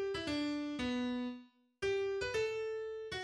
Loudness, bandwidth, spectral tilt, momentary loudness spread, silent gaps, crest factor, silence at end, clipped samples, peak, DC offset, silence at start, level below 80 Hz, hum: -38 LUFS; 11.5 kHz; -4.5 dB/octave; 6 LU; none; 14 dB; 0 s; under 0.1%; -26 dBFS; under 0.1%; 0 s; -62 dBFS; none